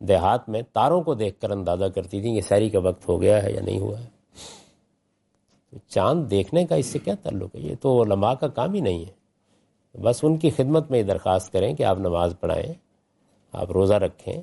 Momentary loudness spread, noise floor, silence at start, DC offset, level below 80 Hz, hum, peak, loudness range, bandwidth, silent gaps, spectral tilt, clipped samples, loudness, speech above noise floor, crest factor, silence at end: 12 LU; -70 dBFS; 0 s; under 0.1%; -54 dBFS; none; -6 dBFS; 3 LU; 11.5 kHz; none; -7 dB/octave; under 0.1%; -23 LUFS; 48 dB; 16 dB; 0 s